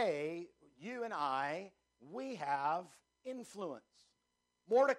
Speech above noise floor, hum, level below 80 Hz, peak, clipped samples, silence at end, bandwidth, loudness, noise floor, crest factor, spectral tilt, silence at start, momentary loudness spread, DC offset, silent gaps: 47 dB; none; -88 dBFS; -20 dBFS; under 0.1%; 0 s; 12 kHz; -40 LUFS; -84 dBFS; 20 dB; -5 dB/octave; 0 s; 17 LU; under 0.1%; none